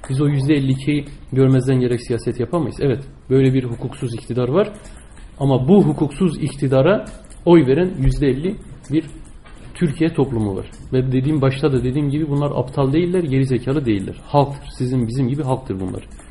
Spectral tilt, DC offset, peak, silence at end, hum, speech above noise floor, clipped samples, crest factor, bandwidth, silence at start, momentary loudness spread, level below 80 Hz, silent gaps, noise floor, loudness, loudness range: -8 dB/octave; 0.3%; -2 dBFS; 0 s; none; 20 dB; under 0.1%; 16 dB; 11.5 kHz; 0.05 s; 11 LU; -36 dBFS; none; -38 dBFS; -19 LUFS; 4 LU